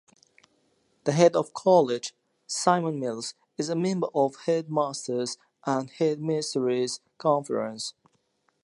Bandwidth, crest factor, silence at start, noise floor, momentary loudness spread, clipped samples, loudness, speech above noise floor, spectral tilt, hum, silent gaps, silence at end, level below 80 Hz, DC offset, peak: 11.5 kHz; 22 dB; 1.05 s; -71 dBFS; 13 LU; under 0.1%; -27 LUFS; 45 dB; -5 dB/octave; none; none; 0.75 s; -80 dBFS; under 0.1%; -6 dBFS